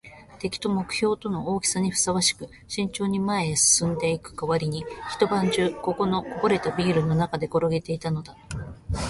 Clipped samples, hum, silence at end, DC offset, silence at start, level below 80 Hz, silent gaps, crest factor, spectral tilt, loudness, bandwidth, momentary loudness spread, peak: under 0.1%; none; 0 s; under 0.1%; 0.05 s; -46 dBFS; none; 18 dB; -4 dB/octave; -24 LUFS; 12 kHz; 12 LU; -6 dBFS